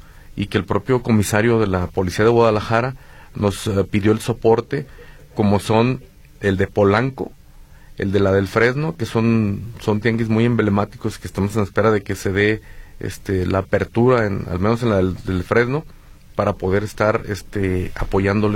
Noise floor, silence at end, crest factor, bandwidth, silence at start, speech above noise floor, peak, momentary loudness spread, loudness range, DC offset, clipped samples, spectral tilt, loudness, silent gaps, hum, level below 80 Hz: -43 dBFS; 0 s; 16 dB; 16.5 kHz; 0.05 s; 25 dB; -2 dBFS; 11 LU; 2 LU; under 0.1%; under 0.1%; -6.5 dB/octave; -19 LUFS; none; none; -38 dBFS